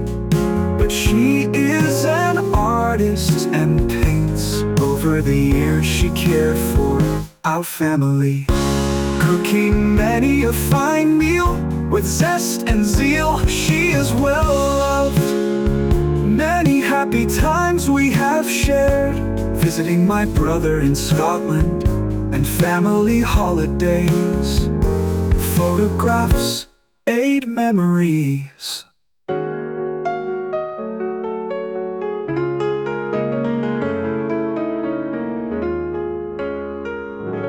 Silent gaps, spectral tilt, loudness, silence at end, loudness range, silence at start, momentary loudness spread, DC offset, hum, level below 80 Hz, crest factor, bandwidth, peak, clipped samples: none; -6 dB/octave; -18 LUFS; 0 s; 6 LU; 0 s; 9 LU; under 0.1%; none; -28 dBFS; 12 dB; 19.5 kHz; -4 dBFS; under 0.1%